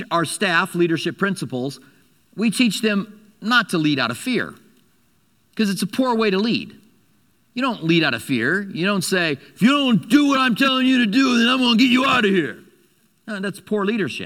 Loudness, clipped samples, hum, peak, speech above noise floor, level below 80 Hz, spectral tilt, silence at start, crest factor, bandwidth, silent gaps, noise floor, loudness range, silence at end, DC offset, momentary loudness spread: -19 LUFS; under 0.1%; none; -2 dBFS; 43 dB; -64 dBFS; -4.5 dB/octave; 0 s; 18 dB; 16 kHz; none; -62 dBFS; 6 LU; 0 s; under 0.1%; 12 LU